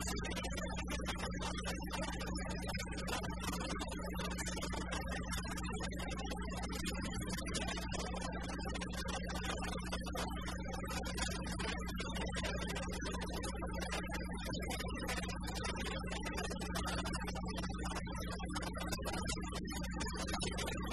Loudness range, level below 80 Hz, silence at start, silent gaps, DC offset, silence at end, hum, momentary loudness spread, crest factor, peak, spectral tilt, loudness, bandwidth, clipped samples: 1 LU; -46 dBFS; 0 s; none; 0.2%; 0 s; none; 3 LU; 18 dB; -24 dBFS; -4 dB/octave; -41 LUFS; 13 kHz; under 0.1%